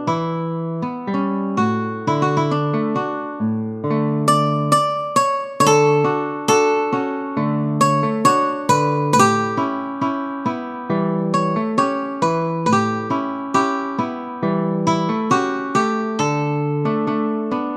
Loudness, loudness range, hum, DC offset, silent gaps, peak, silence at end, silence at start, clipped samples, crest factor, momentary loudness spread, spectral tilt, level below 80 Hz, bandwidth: -19 LUFS; 4 LU; none; under 0.1%; none; 0 dBFS; 0 s; 0 s; under 0.1%; 18 dB; 8 LU; -5.5 dB/octave; -64 dBFS; 15.5 kHz